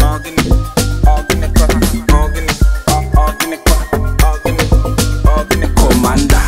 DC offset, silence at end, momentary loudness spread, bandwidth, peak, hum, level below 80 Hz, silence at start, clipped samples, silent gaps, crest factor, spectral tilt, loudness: under 0.1%; 0 s; 4 LU; 16.5 kHz; 0 dBFS; none; -12 dBFS; 0 s; under 0.1%; none; 10 dB; -5 dB/octave; -13 LUFS